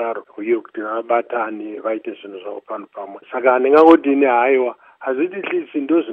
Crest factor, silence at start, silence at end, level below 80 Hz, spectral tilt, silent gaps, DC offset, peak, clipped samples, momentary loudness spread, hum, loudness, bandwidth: 18 dB; 0 s; 0 s; -64 dBFS; -7 dB/octave; none; under 0.1%; 0 dBFS; under 0.1%; 20 LU; none; -17 LUFS; 4.9 kHz